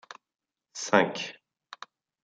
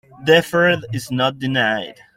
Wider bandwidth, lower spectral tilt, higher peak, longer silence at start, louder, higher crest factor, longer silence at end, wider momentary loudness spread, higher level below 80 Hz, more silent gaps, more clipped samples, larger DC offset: second, 9.4 kHz vs 16 kHz; second, -3.5 dB/octave vs -5 dB/octave; about the same, -4 dBFS vs -2 dBFS; about the same, 0.1 s vs 0.2 s; second, -27 LUFS vs -18 LUFS; first, 28 dB vs 18 dB; first, 0.9 s vs 0.25 s; first, 26 LU vs 9 LU; second, -72 dBFS vs -54 dBFS; neither; neither; neither